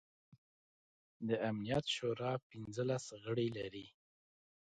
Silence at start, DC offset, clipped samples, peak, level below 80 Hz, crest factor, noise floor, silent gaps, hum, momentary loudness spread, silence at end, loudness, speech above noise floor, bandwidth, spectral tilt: 0.3 s; under 0.1%; under 0.1%; -24 dBFS; -72 dBFS; 18 dB; under -90 dBFS; 0.38-1.20 s, 2.43-2.50 s; none; 10 LU; 0.9 s; -40 LUFS; over 51 dB; 9.4 kHz; -5.5 dB/octave